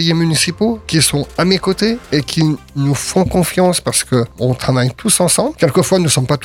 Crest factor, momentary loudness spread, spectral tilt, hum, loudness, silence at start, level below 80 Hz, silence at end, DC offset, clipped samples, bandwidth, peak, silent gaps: 14 dB; 5 LU; -4.5 dB/octave; none; -14 LUFS; 0 s; -38 dBFS; 0 s; under 0.1%; under 0.1%; 17 kHz; 0 dBFS; none